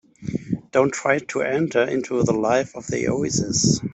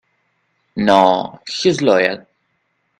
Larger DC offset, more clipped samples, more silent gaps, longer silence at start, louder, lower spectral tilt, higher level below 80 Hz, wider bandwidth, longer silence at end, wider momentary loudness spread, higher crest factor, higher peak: neither; neither; neither; second, 0.2 s vs 0.75 s; second, -22 LUFS vs -15 LUFS; about the same, -4.5 dB/octave vs -5 dB/octave; first, -52 dBFS vs -58 dBFS; second, 8.4 kHz vs 11 kHz; second, 0 s vs 0.8 s; second, 8 LU vs 15 LU; about the same, 18 dB vs 18 dB; second, -4 dBFS vs 0 dBFS